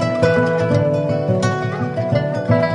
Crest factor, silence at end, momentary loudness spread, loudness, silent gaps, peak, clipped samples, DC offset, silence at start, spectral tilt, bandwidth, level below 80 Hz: 14 dB; 0 s; 5 LU; -18 LUFS; none; -2 dBFS; under 0.1%; under 0.1%; 0 s; -7.5 dB/octave; 11 kHz; -42 dBFS